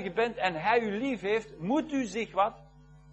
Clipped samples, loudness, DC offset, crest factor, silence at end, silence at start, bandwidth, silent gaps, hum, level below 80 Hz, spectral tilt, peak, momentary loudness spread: under 0.1%; -30 LUFS; under 0.1%; 18 dB; 0 s; 0 s; 8.6 kHz; none; none; -60 dBFS; -5.5 dB/octave; -12 dBFS; 5 LU